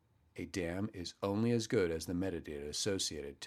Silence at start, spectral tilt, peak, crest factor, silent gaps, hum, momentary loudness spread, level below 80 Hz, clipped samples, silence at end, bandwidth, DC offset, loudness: 0.35 s; -4.5 dB/octave; -20 dBFS; 18 dB; none; none; 10 LU; -60 dBFS; under 0.1%; 0 s; 15 kHz; under 0.1%; -37 LUFS